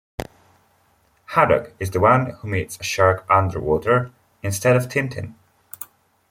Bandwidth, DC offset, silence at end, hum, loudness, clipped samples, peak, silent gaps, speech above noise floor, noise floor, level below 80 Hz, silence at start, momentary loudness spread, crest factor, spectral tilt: 16.5 kHz; under 0.1%; 0.45 s; none; -20 LUFS; under 0.1%; -2 dBFS; none; 42 dB; -61 dBFS; -50 dBFS; 0.2 s; 19 LU; 20 dB; -5.5 dB/octave